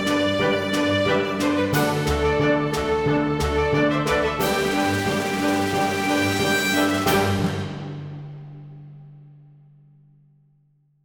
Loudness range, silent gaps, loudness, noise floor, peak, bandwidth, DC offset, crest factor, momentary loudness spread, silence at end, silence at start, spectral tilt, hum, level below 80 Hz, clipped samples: 8 LU; none; -21 LUFS; -62 dBFS; -6 dBFS; 19 kHz; under 0.1%; 16 dB; 14 LU; 1.7 s; 0 s; -5 dB/octave; none; -40 dBFS; under 0.1%